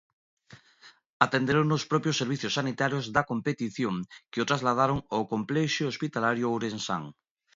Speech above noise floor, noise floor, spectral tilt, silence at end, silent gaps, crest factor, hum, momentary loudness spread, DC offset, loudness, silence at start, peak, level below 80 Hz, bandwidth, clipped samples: 29 dB; -57 dBFS; -5 dB/octave; 0.45 s; 1.06-1.20 s; 26 dB; none; 7 LU; under 0.1%; -28 LUFS; 0.5 s; -4 dBFS; -62 dBFS; 7.8 kHz; under 0.1%